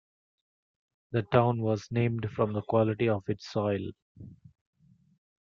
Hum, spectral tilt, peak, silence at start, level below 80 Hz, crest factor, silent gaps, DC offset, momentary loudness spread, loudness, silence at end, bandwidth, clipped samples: none; -8 dB/octave; -8 dBFS; 1.1 s; -64 dBFS; 22 dB; 4.02-4.15 s; under 0.1%; 8 LU; -29 LUFS; 1.05 s; 7 kHz; under 0.1%